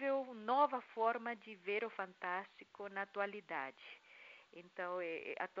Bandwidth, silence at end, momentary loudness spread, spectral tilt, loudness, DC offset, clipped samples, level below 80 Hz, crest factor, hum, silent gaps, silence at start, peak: 7.4 kHz; 0 s; 20 LU; -1.5 dB/octave; -41 LUFS; under 0.1%; under 0.1%; under -90 dBFS; 22 dB; none; none; 0 s; -20 dBFS